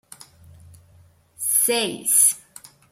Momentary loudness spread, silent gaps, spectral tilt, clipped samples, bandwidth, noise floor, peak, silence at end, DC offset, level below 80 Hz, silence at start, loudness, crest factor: 11 LU; none; -0.5 dB/octave; under 0.1%; 16.5 kHz; -54 dBFS; -4 dBFS; 0.55 s; under 0.1%; -66 dBFS; 1.4 s; -18 LUFS; 22 dB